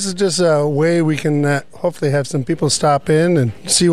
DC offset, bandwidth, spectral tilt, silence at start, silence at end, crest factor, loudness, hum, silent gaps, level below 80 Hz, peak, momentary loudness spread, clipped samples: 1%; 14 kHz; -5 dB/octave; 0 s; 0 s; 14 dB; -16 LUFS; none; none; -50 dBFS; -2 dBFS; 5 LU; under 0.1%